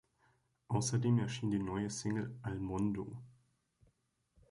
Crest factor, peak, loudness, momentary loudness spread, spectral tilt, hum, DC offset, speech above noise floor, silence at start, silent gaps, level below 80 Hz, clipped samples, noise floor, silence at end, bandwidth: 20 dB; -20 dBFS; -37 LUFS; 9 LU; -6 dB/octave; none; under 0.1%; 42 dB; 0.7 s; none; -62 dBFS; under 0.1%; -78 dBFS; 1.2 s; 11.5 kHz